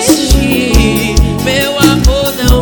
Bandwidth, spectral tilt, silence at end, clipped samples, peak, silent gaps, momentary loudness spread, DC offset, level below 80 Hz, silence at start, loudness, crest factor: 20 kHz; -4.5 dB/octave; 0 s; 0.5%; 0 dBFS; none; 3 LU; under 0.1%; -14 dBFS; 0 s; -10 LUFS; 8 dB